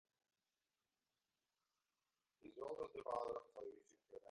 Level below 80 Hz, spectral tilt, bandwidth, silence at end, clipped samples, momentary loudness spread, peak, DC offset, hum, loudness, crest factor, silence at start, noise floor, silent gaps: -86 dBFS; -5.5 dB/octave; 10.5 kHz; 0 s; under 0.1%; 17 LU; -32 dBFS; under 0.1%; none; -50 LUFS; 22 dB; 2.45 s; under -90 dBFS; none